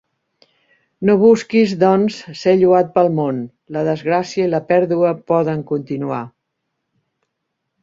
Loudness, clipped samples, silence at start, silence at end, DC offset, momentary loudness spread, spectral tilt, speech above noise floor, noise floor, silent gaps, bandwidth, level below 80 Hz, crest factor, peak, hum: -16 LUFS; under 0.1%; 1 s; 1.55 s; under 0.1%; 11 LU; -7 dB/octave; 60 dB; -75 dBFS; none; 7.6 kHz; -60 dBFS; 16 dB; -2 dBFS; none